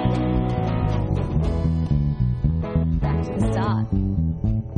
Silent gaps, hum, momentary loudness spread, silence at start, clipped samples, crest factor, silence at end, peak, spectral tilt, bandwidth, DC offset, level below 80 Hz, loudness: none; none; 2 LU; 0 s; under 0.1%; 14 dB; 0 s; -8 dBFS; -9 dB/octave; 9.8 kHz; under 0.1%; -28 dBFS; -23 LUFS